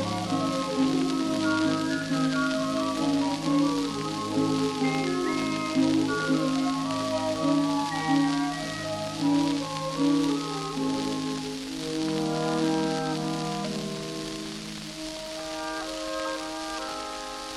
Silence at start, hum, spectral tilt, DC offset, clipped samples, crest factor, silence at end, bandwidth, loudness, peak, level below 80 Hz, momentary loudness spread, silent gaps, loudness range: 0 s; none; -4.5 dB/octave; under 0.1%; under 0.1%; 14 dB; 0 s; 13 kHz; -28 LUFS; -12 dBFS; -56 dBFS; 9 LU; none; 6 LU